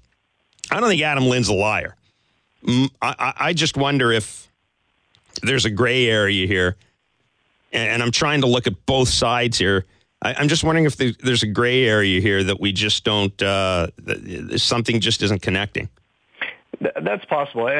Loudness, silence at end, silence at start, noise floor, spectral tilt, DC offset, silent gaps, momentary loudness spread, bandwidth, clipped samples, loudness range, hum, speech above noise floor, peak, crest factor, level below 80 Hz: -19 LUFS; 0 s; 0.65 s; -68 dBFS; -4 dB/octave; under 0.1%; none; 10 LU; 11 kHz; under 0.1%; 3 LU; none; 48 dB; -4 dBFS; 18 dB; -46 dBFS